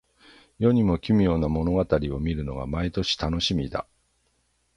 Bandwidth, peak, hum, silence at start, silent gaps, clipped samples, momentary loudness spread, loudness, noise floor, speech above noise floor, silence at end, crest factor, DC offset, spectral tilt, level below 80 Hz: 11 kHz; -6 dBFS; none; 0.6 s; none; under 0.1%; 9 LU; -25 LUFS; -69 dBFS; 46 dB; 0.95 s; 18 dB; under 0.1%; -6.5 dB/octave; -38 dBFS